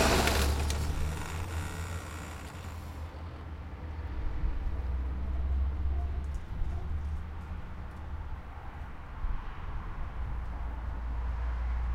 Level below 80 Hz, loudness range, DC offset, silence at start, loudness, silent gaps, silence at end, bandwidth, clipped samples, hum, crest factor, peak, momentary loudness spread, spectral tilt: -36 dBFS; 6 LU; under 0.1%; 0 s; -37 LUFS; none; 0 s; 16.5 kHz; under 0.1%; none; 20 dB; -14 dBFS; 11 LU; -5 dB/octave